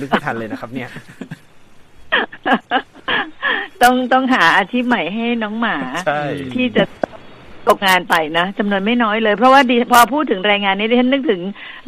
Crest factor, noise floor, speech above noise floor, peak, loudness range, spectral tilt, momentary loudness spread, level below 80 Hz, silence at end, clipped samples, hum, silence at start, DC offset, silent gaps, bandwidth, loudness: 16 dB; -41 dBFS; 26 dB; 0 dBFS; 6 LU; -4 dB/octave; 15 LU; -52 dBFS; 0.05 s; under 0.1%; none; 0 s; under 0.1%; none; 15 kHz; -15 LUFS